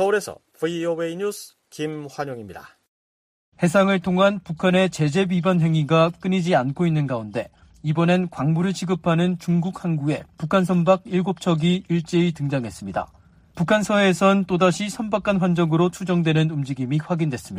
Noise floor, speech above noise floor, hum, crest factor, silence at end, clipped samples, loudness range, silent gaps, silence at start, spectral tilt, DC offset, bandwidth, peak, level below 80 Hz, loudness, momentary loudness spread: under -90 dBFS; over 69 dB; none; 16 dB; 0 s; under 0.1%; 4 LU; 2.88-3.52 s; 0 s; -6.5 dB/octave; under 0.1%; 14.5 kHz; -4 dBFS; -56 dBFS; -21 LUFS; 11 LU